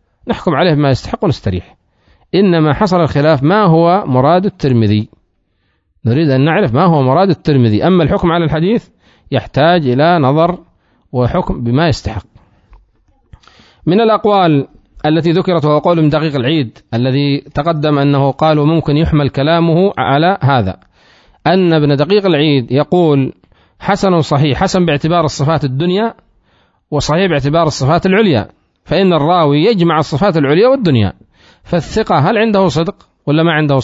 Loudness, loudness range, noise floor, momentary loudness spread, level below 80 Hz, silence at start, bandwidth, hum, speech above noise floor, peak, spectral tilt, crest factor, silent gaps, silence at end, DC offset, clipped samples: -12 LUFS; 3 LU; -61 dBFS; 8 LU; -36 dBFS; 0.25 s; 7.8 kHz; none; 50 dB; 0 dBFS; -7 dB/octave; 12 dB; none; 0 s; under 0.1%; under 0.1%